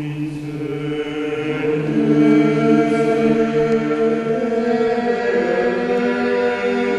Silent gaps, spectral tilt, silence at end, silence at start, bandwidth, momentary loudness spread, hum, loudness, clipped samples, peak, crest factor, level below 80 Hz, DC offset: none; -7 dB/octave; 0 s; 0 s; 10.5 kHz; 9 LU; none; -18 LUFS; under 0.1%; -4 dBFS; 14 dB; -52 dBFS; under 0.1%